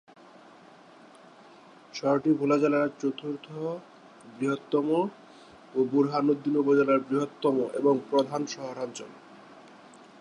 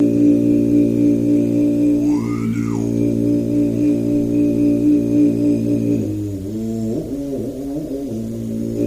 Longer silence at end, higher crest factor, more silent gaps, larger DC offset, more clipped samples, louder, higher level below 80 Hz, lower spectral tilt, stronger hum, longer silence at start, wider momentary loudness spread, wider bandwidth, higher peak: first, 0.6 s vs 0 s; first, 18 dB vs 12 dB; neither; second, under 0.1% vs 0.1%; neither; second, -27 LUFS vs -18 LUFS; second, -78 dBFS vs -42 dBFS; second, -6.5 dB/octave vs -8.5 dB/octave; neither; first, 1.95 s vs 0 s; first, 13 LU vs 10 LU; about the same, 10.5 kHz vs 11 kHz; second, -12 dBFS vs -4 dBFS